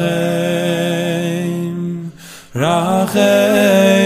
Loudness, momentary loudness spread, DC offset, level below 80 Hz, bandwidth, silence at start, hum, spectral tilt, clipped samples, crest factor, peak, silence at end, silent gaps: -15 LUFS; 14 LU; under 0.1%; -56 dBFS; 16 kHz; 0 s; none; -5.5 dB/octave; under 0.1%; 14 dB; 0 dBFS; 0 s; none